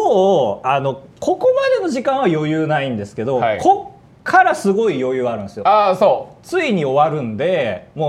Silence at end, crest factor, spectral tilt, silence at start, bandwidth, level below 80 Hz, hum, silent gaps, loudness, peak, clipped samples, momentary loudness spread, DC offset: 0 s; 16 dB; -6 dB/octave; 0 s; 12.5 kHz; -58 dBFS; none; none; -17 LUFS; 0 dBFS; under 0.1%; 9 LU; under 0.1%